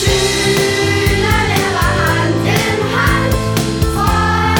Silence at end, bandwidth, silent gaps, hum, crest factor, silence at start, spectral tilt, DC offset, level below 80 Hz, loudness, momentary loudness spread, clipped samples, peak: 0 s; over 20 kHz; none; none; 12 dB; 0 s; -4.5 dB/octave; under 0.1%; -24 dBFS; -14 LUFS; 2 LU; under 0.1%; 0 dBFS